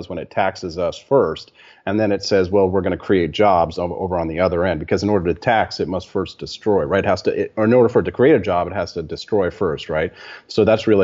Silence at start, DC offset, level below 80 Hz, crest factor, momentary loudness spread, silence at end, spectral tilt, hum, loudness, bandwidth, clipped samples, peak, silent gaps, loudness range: 0 s; under 0.1%; -46 dBFS; 14 dB; 10 LU; 0 s; -5 dB/octave; none; -19 LUFS; 7.8 kHz; under 0.1%; -4 dBFS; none; 2 LU